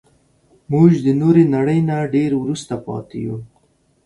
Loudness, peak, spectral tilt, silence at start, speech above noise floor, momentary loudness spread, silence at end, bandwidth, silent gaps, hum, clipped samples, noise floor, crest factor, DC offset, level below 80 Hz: -17 LUFS; 0 dBFS; -8.5 dB/octave; 0.7 s; 43 dB; 14 LU; 0.6 s; 11 kHz; none; none; under 0.1%; -59 dBFS; 16 dB; under 0.1%; -54 dBFS